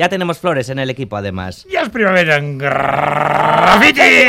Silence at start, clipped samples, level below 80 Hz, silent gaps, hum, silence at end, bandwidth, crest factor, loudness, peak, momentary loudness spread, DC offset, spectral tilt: 0 s; under 0.1%; -46 dBFS; none; none; 0 s; 17 kHz; 12 dB; -13 LUFS; 0 dBFS; 14 LU; under 0.1%; -4.5 dB/octave